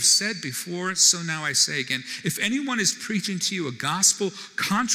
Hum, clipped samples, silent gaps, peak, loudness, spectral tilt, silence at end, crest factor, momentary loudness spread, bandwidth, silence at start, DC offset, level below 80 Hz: none; under 0.1%; none; -6 dBFS; -22 LUFS; -1.5 dB/octave; 0 s; 18 dB; 10 LU; 19 kHz; 0 s; under 0.1%; -70 dBFS